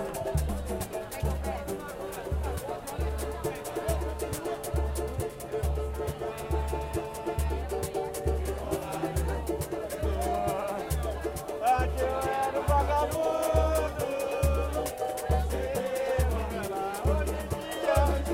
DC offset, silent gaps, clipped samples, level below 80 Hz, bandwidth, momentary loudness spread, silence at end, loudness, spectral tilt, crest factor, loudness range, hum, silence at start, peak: under 0.1%; none; under 0.1%; -34 dBFS; 16.5 kHz; 8 LU; 0 s; -31 LUFS; -5.5 dB/octave; 18 dB; 5 LU; none; 0 s; -12 dBFS